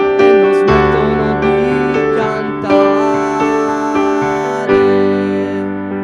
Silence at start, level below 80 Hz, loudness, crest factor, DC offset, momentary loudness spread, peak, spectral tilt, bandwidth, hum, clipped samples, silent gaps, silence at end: 0 s; -36 dBFS; -13 LUFS; 12 dB; under 0.1%; 7 LU; 0 dBFS; -7 dB/octave; 10 kHz; none; under 0.1%; none; 0 s